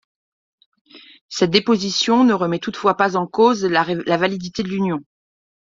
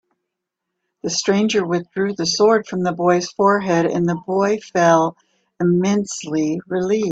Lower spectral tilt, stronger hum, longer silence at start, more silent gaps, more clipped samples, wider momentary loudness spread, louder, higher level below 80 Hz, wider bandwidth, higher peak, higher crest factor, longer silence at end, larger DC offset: about the same, -5 dB/octave vs -5 dB/octave; neither; about the same, 0.95 s vs 1.05 s; first, 1.21-1.29 s vs none; neither; about the same, 9 LU vs 7 LU; about the same, -18 LUFS vs -18 LUFS; about the same, -60 dBFS vs -60 dBFS; second, 7.6 kHz vs 8.4 kHz; about the same, 0 dBFS vs 0 dBFS; about the same, 18 dB vs 18 dB; first, 0.75 s vs 0 s; neither